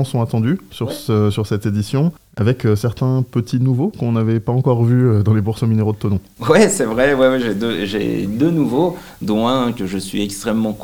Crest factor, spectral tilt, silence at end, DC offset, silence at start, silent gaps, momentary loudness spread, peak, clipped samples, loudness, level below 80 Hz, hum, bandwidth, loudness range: 16 dB; -6.5 dB/octave; 0 s; 0.3%; 0 s; none; 7 LU; 0 dBFS; under 0.1%; -17 LUFS; -48 dBFS; none; 18 kHz; 3 LU